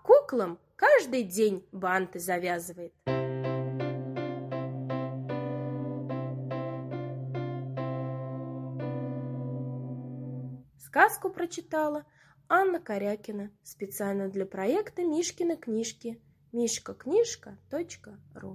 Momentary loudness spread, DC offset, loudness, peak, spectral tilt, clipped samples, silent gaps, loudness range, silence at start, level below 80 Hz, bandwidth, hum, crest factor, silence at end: 15 LU; under 0.1%; -31 LUFS; -6 dBFS; -5.5 dB/octave; under 0.1%; none; 7 LU; 0.05 s; -70 dBFS; 16 kHz; none; 24 dB; 0 s